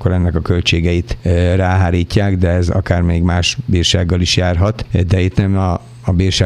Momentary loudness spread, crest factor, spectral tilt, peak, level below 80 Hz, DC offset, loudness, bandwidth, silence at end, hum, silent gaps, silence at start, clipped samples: 4 LU; 14 dB; -5.5 dB/octave; 0 dBFS; -26 dBFS; under 0.1%; -15 LUFS; 10.5 kHz; 0 s; none; none; 0 s; under 0.1%